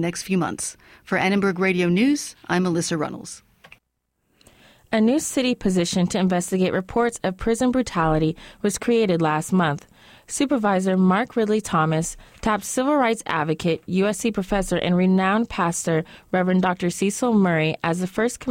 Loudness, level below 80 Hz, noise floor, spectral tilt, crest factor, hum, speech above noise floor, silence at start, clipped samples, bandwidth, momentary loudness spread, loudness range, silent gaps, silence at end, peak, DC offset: -22 LUFS; -46 dBFS; -74 dBFS; -5.5 dB/octave; 14 dB; none; 53 dB; 0 s; under 0.1%; 16 kHz; 7 LU; 3 LU; none; 0 s; -8 dBFS; under 0.1%